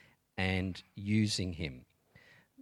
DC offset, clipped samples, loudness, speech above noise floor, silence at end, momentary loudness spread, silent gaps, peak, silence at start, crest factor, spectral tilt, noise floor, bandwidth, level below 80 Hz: under 0.1%; under 0.1%; -35 LUFS; 29 dB; 0 s; 13 LU; none; -18 dBFS; 0.35 s; 20 dB; -5 dB/octave; -63 dBFS; 13.5 kHz; -58 dBFS